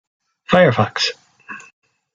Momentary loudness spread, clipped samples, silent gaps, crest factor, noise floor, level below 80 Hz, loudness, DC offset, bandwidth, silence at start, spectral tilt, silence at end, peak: 22 LU; under 0.1%; none; 18 dB; -38 dBFS; -56 dBFS; -16 LUFS; under 0.1%; 7.6 kHz; 0.5 s; -5 dB/octave; 0.55 s; -2 dBFS